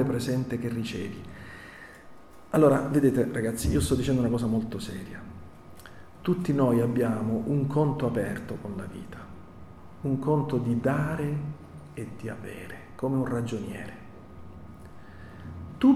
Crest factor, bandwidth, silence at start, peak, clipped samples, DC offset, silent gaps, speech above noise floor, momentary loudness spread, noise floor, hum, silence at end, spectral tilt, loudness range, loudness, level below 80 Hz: 18 dB; 15 kHz; 0 s; -10 dBFS; under 0.1%; under 0.1%; none; 21 dB; 23 LU; -48 dBFS; none; 0 s; -7 dB/octave; 9 LU; -28 LUFS; -48 dBFS